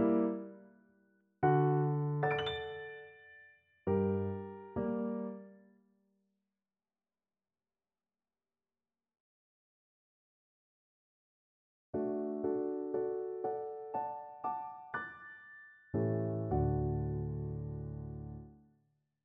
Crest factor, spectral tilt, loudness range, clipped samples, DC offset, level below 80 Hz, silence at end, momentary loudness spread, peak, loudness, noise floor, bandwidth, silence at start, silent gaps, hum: 20 dB; -6.5 dB/octave; 9 LU; under 0.1%; under 0.1%; -56 dBFS; 0.7 s; 18 LU; -18 dBFS; -37 LUFS; under -90 dBFS; 4.1 kHz; 0 s; 9.20-11.93 s; none